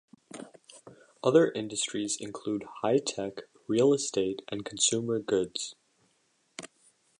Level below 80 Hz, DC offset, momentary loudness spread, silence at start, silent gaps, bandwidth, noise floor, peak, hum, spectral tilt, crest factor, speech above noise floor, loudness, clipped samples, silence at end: -70 dBFS; under 0.1%; 22 LU; 0.35 s; none; 11 kHz; -72 dBFS; -10 dBFS; none; -3.5 dB/octave; 22 dB; 43 dB; -29 LUFS; under 0.1%; 0.55 s